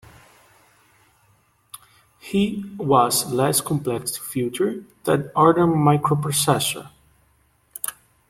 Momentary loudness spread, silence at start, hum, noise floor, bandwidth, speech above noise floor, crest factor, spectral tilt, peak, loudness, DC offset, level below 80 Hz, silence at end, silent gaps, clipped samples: 14 LU; 1.75 s; none; -62 dBFS; 16.5 kHz; 41 dB; 20 dB; -5 dB/octave; -4 dBFS; -21 LUFS; under 0.1%; -56 dBFS; 0.4 s; none; under 0.1%